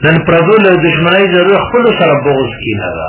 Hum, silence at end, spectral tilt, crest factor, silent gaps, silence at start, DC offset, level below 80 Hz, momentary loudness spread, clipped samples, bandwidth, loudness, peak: none; 0 s; -10 dB/octave; 8 dB; none; 0 s; under 0.1%; -36 dBFS; 8 LU; 0.5%; 4 kHz; -9 LUFS; 0 dBFS